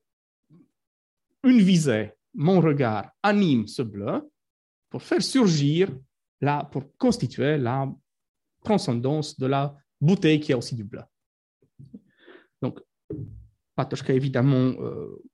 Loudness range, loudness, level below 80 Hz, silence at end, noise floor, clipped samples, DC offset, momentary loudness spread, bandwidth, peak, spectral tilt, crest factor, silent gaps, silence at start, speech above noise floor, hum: 7 LU; -24 LUFS; -62 dBFS; 0.15 s; -53 dBFS; under 0.1%; under 0.1%; 17 LU; 12 kHz; -8 dBFS; -6.5 dB/octave; 18 dB; 4.50-4.82 s, 6.28-6.38 s, 8.28-8.34 s, 11.26-11.60 s, 13.04-13.08 s; 1.45 s; 30 dB; none